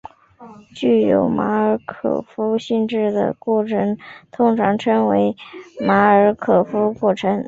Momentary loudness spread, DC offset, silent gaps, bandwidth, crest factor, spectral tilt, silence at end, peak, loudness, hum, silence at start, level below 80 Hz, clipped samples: 8 LU; under 0.1%; none; 7.8 kHz; 16 dB; -7.5 dB/octave; 0 s; -2 dBFS; -18 LUFS; none; 0.05 s; -56 dBFS; under 0.1%